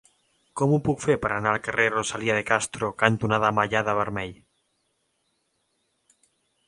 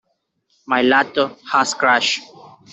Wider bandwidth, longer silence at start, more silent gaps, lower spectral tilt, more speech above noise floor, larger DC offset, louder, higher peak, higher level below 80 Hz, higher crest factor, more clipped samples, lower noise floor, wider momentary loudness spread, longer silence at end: first, 11.5 kHz vs 8.4 kHz; second, 0.55 s vs 0.7 s; neither; first, -5 dB/octave vs -2 dB/octave; about the same, 49 dB vs 51 dB; neither; second, -24 LUFS vs -17 LUFS; about the same, -2 dBFS vs -2 dBFS; first, -54 dBFS vs -64 dBFS; first, 26 dB vs 18 dB; neither; first, -73 dBFS vs -68 dBFS; about the same, 7 LU vs 7 LU; first, 2.35 s vs 0.25 s